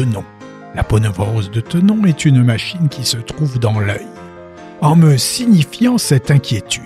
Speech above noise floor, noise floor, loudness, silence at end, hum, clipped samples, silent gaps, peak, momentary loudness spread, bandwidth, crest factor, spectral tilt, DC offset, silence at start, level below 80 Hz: 21 dB; -34 dBFS; -14 LUFS; 0 s; none; under 0.1%; none; 0 dBFS; 15 LU; 15 kHz; 14 dB; -5.5 dB/octave; under 0.1%; 0 s; -38 dBFS